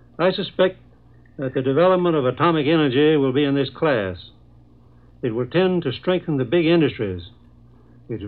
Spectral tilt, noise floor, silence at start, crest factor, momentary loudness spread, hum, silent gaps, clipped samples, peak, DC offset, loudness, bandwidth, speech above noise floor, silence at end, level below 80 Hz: -10.5 dB/octave; -50 dBFS; 0.2 s; 16 dB; 11 LU; none; none; under 0.1%; -6 dBFS; 0.2%; -20 LUFS; 4.6 kHz; 31 dB; 0 s; -54 dBFS